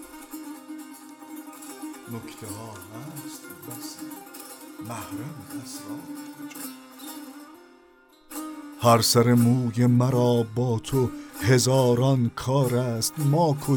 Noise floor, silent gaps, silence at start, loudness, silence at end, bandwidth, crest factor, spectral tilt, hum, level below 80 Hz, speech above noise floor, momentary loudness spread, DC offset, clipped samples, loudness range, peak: -56 dBFS; none; 0 s; -22 LUFS; 0 s; 19.5 kHz; 20 dB; -5.5 dB/octave; none; -58 dBFS; 32 dB; 21 LU; under 0.1%; under 0.1%; 17 LU; -6 dBFS